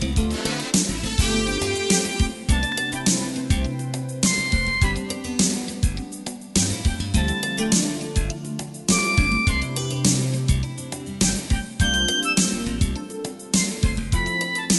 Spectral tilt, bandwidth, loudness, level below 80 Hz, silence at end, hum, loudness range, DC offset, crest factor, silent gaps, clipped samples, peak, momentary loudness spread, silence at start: -3.5 dB/octave; 12 kHz; -22 LUFS; -30 dBFS; 0 s; none; 1 LU; under 0.1%; 18 dB; none; under 0.1%; -4 dBFS; 8 LU; 0 s